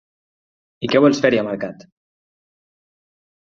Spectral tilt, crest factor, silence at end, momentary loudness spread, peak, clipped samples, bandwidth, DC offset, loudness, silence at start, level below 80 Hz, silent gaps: -5.5 dB/octave; 20 dB; 1.7 s; 15 LU; -2 dBFS; under 0.1%; 7.6 kHz; under 0.1%; -17 LUFS; 0.8 s; -62 dBFS; none